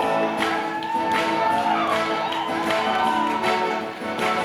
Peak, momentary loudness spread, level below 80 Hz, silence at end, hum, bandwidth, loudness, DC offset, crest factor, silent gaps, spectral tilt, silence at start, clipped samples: -8 dBFS; 4 LU; -60 dBFS; 0 s; none; 19.5 kHz; -22 LUFS; under 0.1%; 14 dB; none; -4 dB/octave; 0 s; under 0.1%